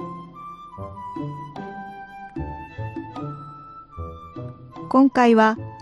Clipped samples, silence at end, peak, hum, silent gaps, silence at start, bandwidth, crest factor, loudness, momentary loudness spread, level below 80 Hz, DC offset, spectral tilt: under 0.1%; 0 s; -4 dBFS; none; none; 0 s; 10 kHz; 20 dB; -21 LUFS; 23 LU; -48 dBFS; under 0.1%; -7 dB/octave